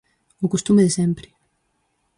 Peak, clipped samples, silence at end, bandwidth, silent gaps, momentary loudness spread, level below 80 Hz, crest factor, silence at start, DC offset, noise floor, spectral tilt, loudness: -6 dBFS; under 0.1%; 0.95 s; 11 kHz; none; 11 LU; -54 dBFS; 16 dB; 0.4 s; under 0.1%; -69 dBFS; -6 dB/octave; -20 LUFS